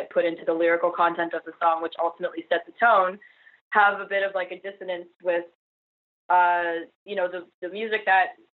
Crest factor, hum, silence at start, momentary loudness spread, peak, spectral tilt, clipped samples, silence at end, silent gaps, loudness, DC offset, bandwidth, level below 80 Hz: 20 dB; none; 0 s; 13 LU; -6 dBFS; -1 dB/octave; under 0.1%; 0.2 s; 3.61-3.71 s, 5.16-5.20 s, 5.55-6.29 s, 6.95-7.06 s, 7.54-7.62 s; -24 LUFS; under 0.1%; 4.5 kHz; -82 dBFS